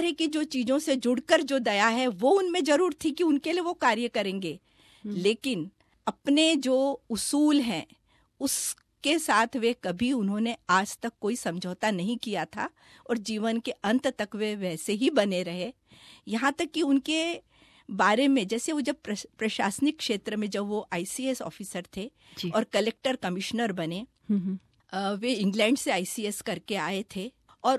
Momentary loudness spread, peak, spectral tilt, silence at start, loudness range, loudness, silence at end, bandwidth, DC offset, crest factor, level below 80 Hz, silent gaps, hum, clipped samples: 12 LU; -8 dBFS; -4 dB/octave; 0 s; 5 LU; -28 LUFS; 0 s; 14.5 kHz; under 0.1%; 20 dB; -66 dBFS; none; none; under 0.1%